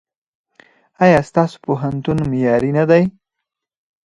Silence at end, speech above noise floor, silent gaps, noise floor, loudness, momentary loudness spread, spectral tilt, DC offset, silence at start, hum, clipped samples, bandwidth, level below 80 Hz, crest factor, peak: 0.95 s; 65 dB; none; -80 dBFS; -16 LUFS; 7 LU; -8 dB/octave; under 0.1%; 1 s; none; under 0.1%; 11 kHz; -48 dBFS; 18 dB; 0 dBFS